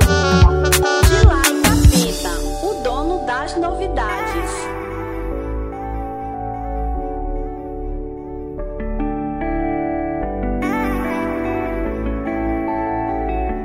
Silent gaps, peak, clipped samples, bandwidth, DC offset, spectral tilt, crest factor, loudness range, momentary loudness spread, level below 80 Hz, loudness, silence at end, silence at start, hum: none; 0 dBFS; under 0.1%; 16 kHz; 0.2%; -5 dB/octave; 18 dB; 11 LU; 14 LU; -24 dBFS; -19 LUFS; 0 s; 0 s; none